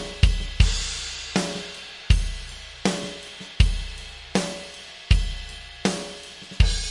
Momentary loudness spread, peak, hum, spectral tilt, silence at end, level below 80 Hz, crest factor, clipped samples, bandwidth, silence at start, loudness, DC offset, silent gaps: 15 LU; -2 dBFS; none; -4.5 dB/octave; 0 s; -26 dBFS; 22 dB; under 0.1%; 11.5 kHz; 0 s; -26 LUFS; under 0.1%; none